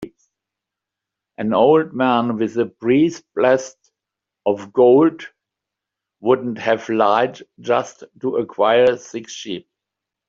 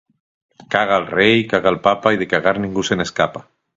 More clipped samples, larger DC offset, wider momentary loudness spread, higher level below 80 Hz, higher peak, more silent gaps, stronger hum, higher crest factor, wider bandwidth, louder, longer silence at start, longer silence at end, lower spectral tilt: neither; neither; first, 16 LU vs 7 LU; second, -64 dBFS vs -50 dBFS; about the same, 0 dBFS vs 0 dBFS; neither; neither; about the same, 18 dB vs 18 dB; about the same, 7.6 kHz vs 8 kHz; about the same, -18 LUFS vs -17 LUFS; second, 0 s vs 0.7 s; first, 0.7 s vs 0.35 s; about the same, -5.5 dB/octave vs -5 dB/octave